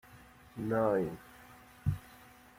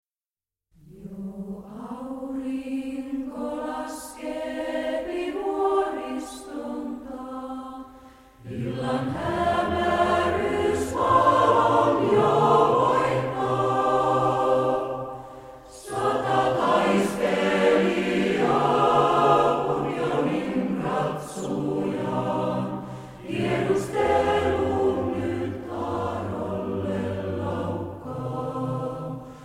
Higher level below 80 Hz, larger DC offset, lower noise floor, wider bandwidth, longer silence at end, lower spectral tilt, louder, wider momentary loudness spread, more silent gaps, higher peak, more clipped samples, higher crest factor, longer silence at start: about the same, -56 dBFS vs -52 dBFS; neither; second, -57 dBFS vs under -90 dBFS; about the same, 16.5 kHz vs 16 kHz; first, 0.35 s vs 0 s; first, -8 dB/octave vs -6 dB/octave; second, -35 LUFS vs -24 LUFS; first, 25 LU vs 16 LU; neither; second, -18 dBFS vs -6 dBFS; neither; about the same, 18 dB vs 18 dB; second, 0.1 s vs 0.9 s